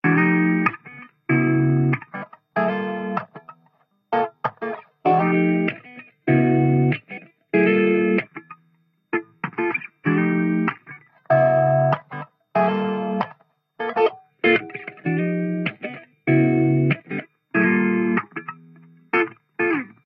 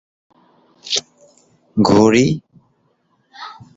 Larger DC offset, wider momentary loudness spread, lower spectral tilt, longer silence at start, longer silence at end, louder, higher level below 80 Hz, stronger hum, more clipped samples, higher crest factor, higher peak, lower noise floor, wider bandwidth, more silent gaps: neither; second, 17 LU vs 24 LU; first, -10.5 dB/octave vs -5 dB/octave; second, 0.05 s vs 0.85 s; about the same, 0.2 s vs 0.25 s; second, -21 LUFS vs -16 LUFS; second, -66 dBFS vs -50 dBFS; neither; neither; about the same, 18 dB vs 18 dB; about the same, -4 dBFS vs -2 dBFS; about the same, -64 dBFS vs -62 dBFS; second, 5.2 kHz vs 8 kHz; neither